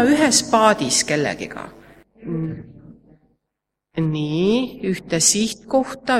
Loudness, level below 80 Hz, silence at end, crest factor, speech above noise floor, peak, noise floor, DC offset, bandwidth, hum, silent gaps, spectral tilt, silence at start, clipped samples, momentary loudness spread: -19 LUFS; -54 dBFS; 0 s; 20 dB; 62 dB; 0 dBFS; -80 dBFS; under 0.1%; 16 kHz; none; none; -3.5 dB/octave; 0 s; under 0.1%; 17 LU